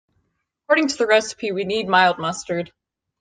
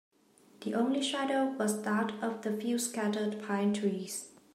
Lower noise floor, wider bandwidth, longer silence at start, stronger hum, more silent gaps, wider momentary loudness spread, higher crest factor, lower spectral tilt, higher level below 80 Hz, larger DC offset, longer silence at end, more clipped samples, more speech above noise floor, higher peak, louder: first, -72 dBFS vs -63 dBFS; second, 10 kHz vs 16 kHz; about the same, 0.7 s vs 0.6 s; neither; neither; first, 11 LU vs 6 LU; about the same, 18 dB vs 14 dB; about the same, -3.5 dB/octave vs -4.5 dB/octave; first, -64 dBFS vs -84 dBFS; neither; first, 0.55 s vs 0.25 s; neither; first, 52 dB vs 31 dB; first, -2 dBFS vs -18 dBFS; first, -20 LUFS vs -33 LUFS